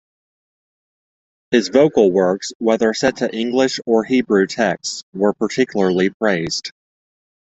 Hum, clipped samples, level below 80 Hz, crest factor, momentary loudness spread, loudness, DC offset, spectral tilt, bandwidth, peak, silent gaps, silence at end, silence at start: none; under 0.1%; -58 dBFS; 18 dB; 7 LU; -17 LUFS; under 0.1%; -4.5 dB/octave; 8.2 kHz; -2 dBFS; 2.55-2.60 s, 5.03-5.13 s, 6.14-6.20 s; 0.85 s; 1.5 s